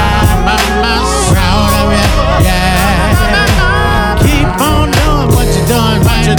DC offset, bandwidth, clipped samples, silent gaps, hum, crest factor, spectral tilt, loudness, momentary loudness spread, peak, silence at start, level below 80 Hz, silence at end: under 0.1%; over 20 kHz; 0.1%; none; none; 8 dB; -5 dB/octave; -10 LUFS; 1 LU; 0 dBFS; 0 s; -14 dBFS; 0 s